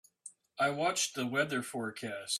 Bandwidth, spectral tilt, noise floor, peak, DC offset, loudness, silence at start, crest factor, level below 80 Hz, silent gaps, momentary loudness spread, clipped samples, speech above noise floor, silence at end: 15.5 kHz; -2.5 dB/octave; -56 dBFS; -18 dBFS; under 0.1%; -33 LUFS; 0.25 s; 18 dB; -78 dBFS; none; 18 LU; under 0.1%; 22 dB; 0 s